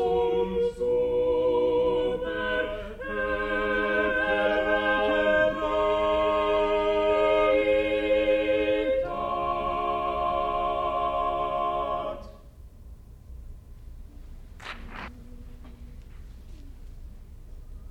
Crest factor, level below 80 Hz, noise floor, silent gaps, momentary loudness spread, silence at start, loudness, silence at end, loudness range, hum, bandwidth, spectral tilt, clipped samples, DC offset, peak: 16 dB; -44 dBFS; -47 dBFS; none; 12 LU; 0 s; -25 LUFS; 0 s; 21 LU; none; 8.8 kHz; -6 dB/octave; under 0.1%; under 0.1%; -12 dBFS